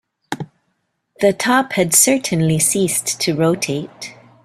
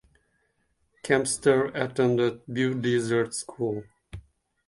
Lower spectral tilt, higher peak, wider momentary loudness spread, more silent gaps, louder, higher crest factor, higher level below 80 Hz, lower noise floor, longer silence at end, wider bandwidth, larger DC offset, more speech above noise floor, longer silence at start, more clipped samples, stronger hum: second, -3.5 dB/octave vs -5 dB/octave; first, 0 dBFS vs -6 dBFS; about the same, 19 LU vs 21 LU; neither; first, -16 LUFS vs -26 LUFS; about the same, 18 dB vs 20 dB; about the same, -56 dBFS vs -58 dBFS; about the same, -69 dBFS vs -72 dBFS; second, 0.3 s vs 0.45 s; first, 16 kHz vs 11.5 kHz; neither; first, 53 dB vs 46 dB; second, 0.3 s vs 1.05 s; neither; neither